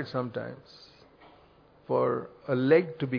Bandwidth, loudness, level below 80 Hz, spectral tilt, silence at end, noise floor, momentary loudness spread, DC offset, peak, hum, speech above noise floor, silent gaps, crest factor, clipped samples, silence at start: 5.4 kHz; -28 LUFS; -70 dBFS; -9 dB/octave; 0 s; -58 dBFS; 16 LU; under 0.1%; -10 dBFS; none; 30 dB; none; 20 dB; under 0.1%; 0 s